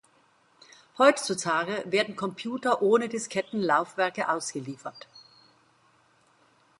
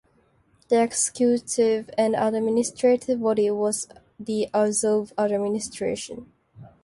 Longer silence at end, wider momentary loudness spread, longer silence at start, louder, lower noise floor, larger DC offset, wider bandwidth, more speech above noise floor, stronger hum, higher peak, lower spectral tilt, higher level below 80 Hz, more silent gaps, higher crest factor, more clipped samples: first, 1.6 s vs 0.2 s; first, 16 LU vs 9 LU; first, 0.95 s vs 0.7 s; second, -26 LUFS vs -23 LUFS; about the same, -64 dBFS vs -63 dBFS; neither; about the same, 11.5 kHz vs 11.5 kHz; about the same, 37 dB vs 40 dB; neither; first, -4 dBFS vs -8 dBFS; about the same, -3.5 dB/octave vs -4 dB/octave; second, -78 dBFS vs -64 dBFS; neither; first, 24 dB vs 16 dB; neither